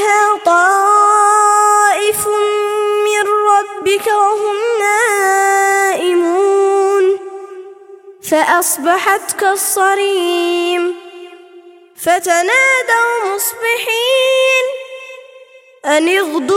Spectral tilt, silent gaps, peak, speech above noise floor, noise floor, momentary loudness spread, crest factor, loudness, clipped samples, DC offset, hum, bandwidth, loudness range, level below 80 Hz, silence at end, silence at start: -1 dB/octave; none; 0 dBFS; 28 dB; -41 dBFS; 8 LU; 12 dB; -12 LUFS; under 0.1%; under 0.1%; none; 17 kHz; 4 LU; -64 dBFS; 0 s; 0 s